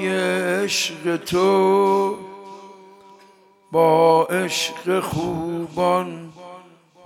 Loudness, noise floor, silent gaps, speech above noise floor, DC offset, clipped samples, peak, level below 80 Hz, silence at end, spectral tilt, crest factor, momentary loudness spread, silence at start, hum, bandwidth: -20 LUFS; -52 dBFS; none; 33 dB; under 0.1%; under 0.1%; -4 dBFS; -58 dBFS; 0.45 s; -4.5 dB/octave; 18 dB; 19 LU; 0 s; none; 16.5 kHz